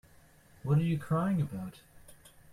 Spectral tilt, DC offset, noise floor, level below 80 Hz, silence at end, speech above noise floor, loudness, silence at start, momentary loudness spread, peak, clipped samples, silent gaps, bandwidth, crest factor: -8.5 dB/octave; under 0.1%; -60 dBFS; -60 dBFS; 0.25 s; 29 dB; -32 LUFS; 0.65 s; 14 LU; -16 dBFS; under 0.1%; none; 14.5 kHz; 16 dB